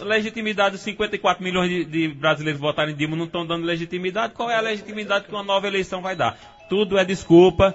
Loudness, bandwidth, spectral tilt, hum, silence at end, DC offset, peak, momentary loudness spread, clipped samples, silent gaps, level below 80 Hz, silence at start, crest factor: -22 LUFS; 8 kHz; -5.5 dB/octave; none; 0 s; under 0.1%; -2 dBFS; 8 LU; under 0.1%; none; -48 dBFS; 0 s; 20 dB